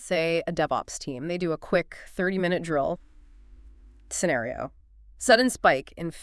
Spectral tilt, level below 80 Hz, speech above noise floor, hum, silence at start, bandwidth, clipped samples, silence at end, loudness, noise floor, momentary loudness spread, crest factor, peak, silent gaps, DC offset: -4 dB/octave; -52 dBFS; 24 dB; none; 0 s; 12 kHz; under 0.1%; 0 s; -26 LUFS; -50 dBFS; 14 LU; 22 dB; -6 dBFS; none; under 0.1%